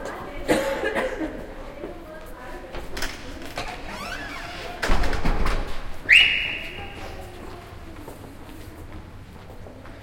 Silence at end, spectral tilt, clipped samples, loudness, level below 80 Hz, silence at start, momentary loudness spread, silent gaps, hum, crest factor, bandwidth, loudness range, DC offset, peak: 0 s; -3.5 dB/octave; under 0.1%; -23 LUFS; -32 dBFS; 0 s; 20 LU; none; none; 24 dB; 16.5 kHz; 13 LU; under 0.1%; -2 dBFS